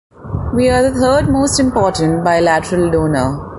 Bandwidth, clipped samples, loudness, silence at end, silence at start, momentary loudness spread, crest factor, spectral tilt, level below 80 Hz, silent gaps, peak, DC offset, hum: 11.5 kHz; under 0.1%; -14 LUFS; 0 s; 0.2 s; 5 LU; 12 dB; -5.5 dB/octave; -30 dBFS; none; 0 dBFS; under 0.1%; none